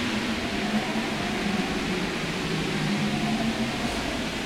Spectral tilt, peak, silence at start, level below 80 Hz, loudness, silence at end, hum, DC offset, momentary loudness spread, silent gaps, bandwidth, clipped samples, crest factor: -4.5 dB/octave; -14 dBFS; 0 s; -46 dBFS; -27 LUFS; 0 s; none; under 0.1%; 2 LU; none; 16 kHz; under 0.1%; 14 dB